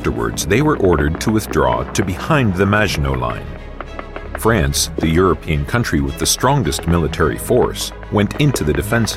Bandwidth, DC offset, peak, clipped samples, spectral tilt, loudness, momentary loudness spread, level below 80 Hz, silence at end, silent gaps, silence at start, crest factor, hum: 16.5 kHz; under 0.1%; -2 dBFS; under 0.1%; -5 dB/octave; -17 LUFS; 9 LU; -28 dBFS; 0 s; none; 0 s; 14 dB; none